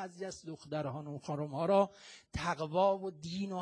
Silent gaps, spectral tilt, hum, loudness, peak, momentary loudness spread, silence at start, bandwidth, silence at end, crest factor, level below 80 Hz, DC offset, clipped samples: none; -6 dB/octave; none; -35 LUFS; -16 dBFS; 13 LU; 0 s; 10.5 kHz; 0 s; 18 dB; -60 dBFS; under 0.1%; under 0.1%